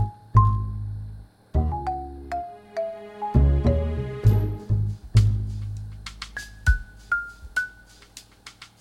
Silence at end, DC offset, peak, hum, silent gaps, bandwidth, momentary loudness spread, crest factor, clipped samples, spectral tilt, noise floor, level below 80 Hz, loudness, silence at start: 0.15 s; under 0.1%; -4 dBFS; none; none; 13 kHz; 19 LU; 22 dB; under 0.1%; -7 dB/octave; -49 dBFS; -30 dBFS; -25 LUFS; 0 s